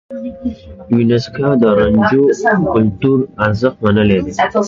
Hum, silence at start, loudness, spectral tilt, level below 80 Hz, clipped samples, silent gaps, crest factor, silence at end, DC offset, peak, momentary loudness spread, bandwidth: none; 0.1 s; -13 LUFS; -7.5 dB/octave; -38 dBFS; under 0.1%; none; 14 dB; 0 s; under 0.1%; 0 dBFS; 12 LU; 7.6 kHz